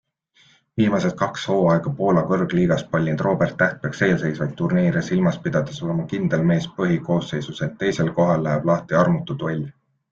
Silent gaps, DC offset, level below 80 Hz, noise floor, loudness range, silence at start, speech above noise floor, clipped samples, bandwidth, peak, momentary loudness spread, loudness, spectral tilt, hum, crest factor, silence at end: none; under 0.1%; -54 dBFS; -58 dBFS; 2 LU; 0.75 s; 38 dB; under 0.1%; 7.4 kHz; -4 dBFS; 7 LU; -21 LUFS; -7 dB/octave; none; 18 dB; 0.4 s